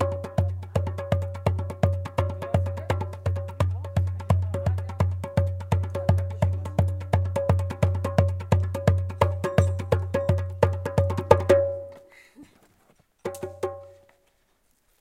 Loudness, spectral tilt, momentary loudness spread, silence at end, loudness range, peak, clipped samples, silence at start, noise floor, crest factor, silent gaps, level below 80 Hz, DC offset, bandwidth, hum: -26 LUFS; -8 dB/octave; 6 LU; 1.1 s; 4 LU; 0 dBFS; under 0.1%; 0 s; -67 dBFS; 24 dB; none; -42 dBFS; under 0.1%; 12 kHz; none